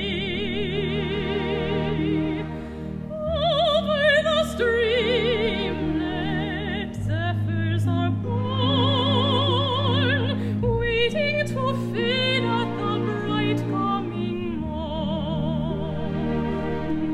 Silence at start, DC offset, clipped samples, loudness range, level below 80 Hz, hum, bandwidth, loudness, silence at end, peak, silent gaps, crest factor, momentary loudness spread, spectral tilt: 0 s; under 0.1%; under 0.1%; 4 LU; -40 dBFS; none; 12 kHz; -24 LUFS; 0 s; -8 dBFS; none; 16 dB; 8 LU; -6.5 dB/octave